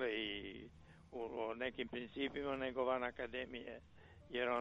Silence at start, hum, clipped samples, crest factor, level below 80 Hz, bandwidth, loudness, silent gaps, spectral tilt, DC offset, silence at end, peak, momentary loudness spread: 0 s; none; under 0.1%; 18 dB; -66 dBFS; 7.6 kHz; -43 LUFS; none; -6 dB/octave; under 0.1%; 0 s; -26 dBFS; 17 LU